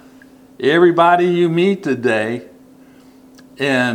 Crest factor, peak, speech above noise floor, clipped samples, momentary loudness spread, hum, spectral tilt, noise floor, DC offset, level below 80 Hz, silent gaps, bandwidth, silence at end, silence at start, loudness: 16 dB; 0 dBFS; 30 dB; under 0.1%; 10 LU; none; -6.5 dB/octave; -45 dBFS; under 0.1%; -64 dBFS; none; 9.8 kHz; 0 s; 0.6 s; -15 LUFS